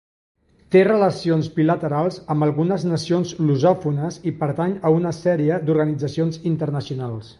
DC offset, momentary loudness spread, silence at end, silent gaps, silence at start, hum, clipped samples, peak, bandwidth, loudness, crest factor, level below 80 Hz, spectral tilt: under 0.1%; 7 LU; 0.05 s; none; 0.7 s; none; under 0.1%; -4 dBFS; 11 kHz; -20 LUFS; 16 dB; -56 dBFS; -7.5 dB/octave